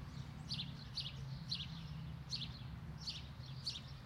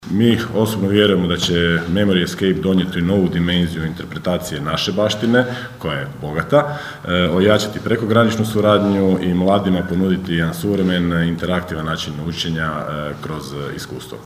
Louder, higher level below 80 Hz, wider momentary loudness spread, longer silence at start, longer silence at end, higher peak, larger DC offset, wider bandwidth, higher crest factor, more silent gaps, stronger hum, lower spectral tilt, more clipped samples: second, -46 LUFS vs -18 LUFS; second, -58 dBFS vs -42 dBFS; second, 7 LU vs 10 LU; about the same, 0 s vs 0 s; about the same, 0 s vs 0 s; second, -30 dBFS vs 0 dBFS; neither; about the same, 16 kHz vs 15.5 kHz; about the same, 18 dB vs 18 dB; neither; neither; second, -4.5 dB/octave vs -6 dB/octave; neither